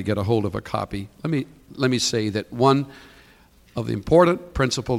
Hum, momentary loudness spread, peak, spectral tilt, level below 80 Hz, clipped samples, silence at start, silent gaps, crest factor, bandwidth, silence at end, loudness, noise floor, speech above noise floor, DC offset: none; 14 LU; -4 dBFS; -5.5 dB/octave; -44 dBFS; under 0.1%; 0 s; none; 18 dB; 16 kHz; 0 s; -22 LUFS; -53 dBFS; 31 dB; under 0.1%